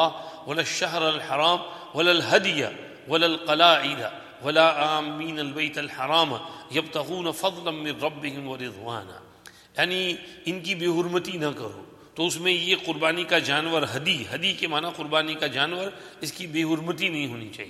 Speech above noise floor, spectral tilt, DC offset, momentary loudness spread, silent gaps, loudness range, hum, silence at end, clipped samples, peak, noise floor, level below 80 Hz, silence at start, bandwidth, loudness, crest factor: 25 dB; -3.5 dB/octave; under 0.1%; 14 LU; none; 7 LU; none; 0 s; under 0.1%; -2 dBFS; -50 dBFS; -70 dBFS; 0 s; 15.5 kHz; -24 LUFS; 24 dB